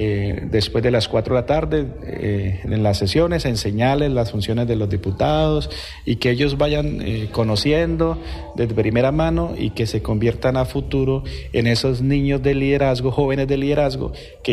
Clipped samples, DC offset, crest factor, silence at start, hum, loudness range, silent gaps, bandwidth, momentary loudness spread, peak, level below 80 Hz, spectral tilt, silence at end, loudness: under 0.1%; under 0.1%; 12 dB; 0 s; none; 1 LU; none; 14 kHz; 6 LU; -6 dBFS; -32 dBFS; -6.5 dB/octave; 0 s; -20 LUFS